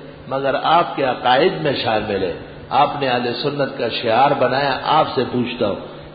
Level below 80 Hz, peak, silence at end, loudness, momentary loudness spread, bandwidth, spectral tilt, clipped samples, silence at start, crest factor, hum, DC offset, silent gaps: -50 dBFS; -2 dBFS; 0 s; -18 LUFS; 7 LU; 5 kHz; -10.5 dB/octave; under 0.1%; 0 s; 16 dB; none; under 0.1%; none